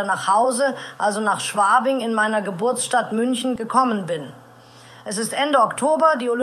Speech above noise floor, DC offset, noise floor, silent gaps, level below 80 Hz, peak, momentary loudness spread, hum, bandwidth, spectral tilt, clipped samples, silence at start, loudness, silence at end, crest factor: 26 dB; under 0.1%; -46 dBFS; none; -68 dBFS; -2 dBFS; 9 LU; none; 13.5 kHz; -3.5 dB/octave; under 0.1%; 0 s; -20 LUFS; 0 s; 18 dB